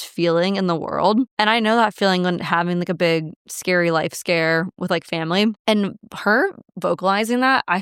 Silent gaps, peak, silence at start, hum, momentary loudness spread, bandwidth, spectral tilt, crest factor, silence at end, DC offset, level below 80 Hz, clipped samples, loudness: 1.31-1.37 s, 3.36-3.45 s, 5.59-5.65 s; -2 dBFS; 0 s; none; 7 LU; 17 kHz; -5 dB/octave; 18 dB; 0 s; under 0.1%; -66 dBFS; under 0.1%; -19 LUFS